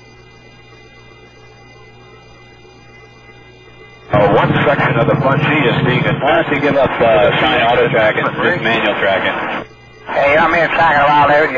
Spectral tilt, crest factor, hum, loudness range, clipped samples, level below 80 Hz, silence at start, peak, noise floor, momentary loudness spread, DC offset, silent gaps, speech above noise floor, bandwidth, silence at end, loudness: -7 dB/octave; 12 dB; none; 5 LU; under 0.1%; -42 dBFS; 4.05 s; -2 dBFS; -41 dBFS; 5 LU; under 0.1%; none; 28 dB; 7.6 kHz; 0 s; -12 LUFS